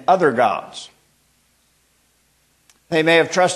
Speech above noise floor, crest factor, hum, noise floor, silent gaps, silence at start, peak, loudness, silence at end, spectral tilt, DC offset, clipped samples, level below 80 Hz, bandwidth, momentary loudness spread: 45 dB; 18 dB; none; -61 dBFS; none; 0.1 s; -2 dBFS; -17 LUFS; 0 s; -4 dB/octave; under 0.1%; under 0.1%; -68 dBFS; 12.5 kHz; 21 LU